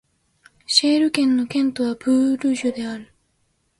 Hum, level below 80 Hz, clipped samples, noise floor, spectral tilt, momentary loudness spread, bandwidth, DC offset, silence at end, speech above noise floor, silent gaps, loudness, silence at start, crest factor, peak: none; -64 dBFS; under 0.1%; -67 dBFS; -3 dB/octave; 11 LU; 11.5 kHz; under 0.1%; 0.75 s; 48 dB; none; -20 LUFS; 0.7 s; 20 dB; -2 dBFS